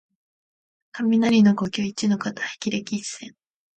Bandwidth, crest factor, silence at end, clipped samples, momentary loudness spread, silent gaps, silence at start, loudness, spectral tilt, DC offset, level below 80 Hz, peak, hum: 9 kHz; 16 dB; 0.5 s; under 0.1%; 18 LU; none; 0.95 s; -22 LUFS; -5 dB/octave; under 0.1%; -64 dBFS; -8 dBFS; none